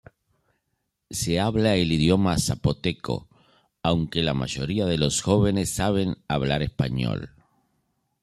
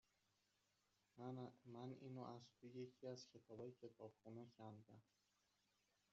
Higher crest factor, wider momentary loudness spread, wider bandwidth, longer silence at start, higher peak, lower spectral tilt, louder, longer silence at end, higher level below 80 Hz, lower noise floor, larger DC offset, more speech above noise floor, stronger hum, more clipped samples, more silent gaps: about the same, 20 dB vs 18 dB; about the same, 8 LU vs 6 LU; first, 14 kHz vs 7.4 kHz; about the same, 1.1 s vs 1.15 s; first, -6 dBFS vs -42 dBFS; second, -5 dB/octave vs -7 dB/octave; first, -24 LUFS vs -59 LUFS; second, 0.95 s vs 1.1 s; first, -44 dBFS vs under -90 dBFS; second, -77 dBFS vs -86 dBFS; neither; first, 54 dB vs 28 dB; neither; neither; neither